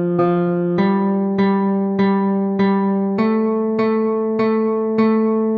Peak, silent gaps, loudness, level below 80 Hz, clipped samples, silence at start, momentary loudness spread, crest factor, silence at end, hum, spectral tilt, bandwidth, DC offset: -4 dBFS; none; -17 LUFS; -62 dBFS; under 0.1%; 0 s; 2 LU; 12 dB; 0 s; none; -10.5 dB/octave; 4.8 kHz; under 0.1%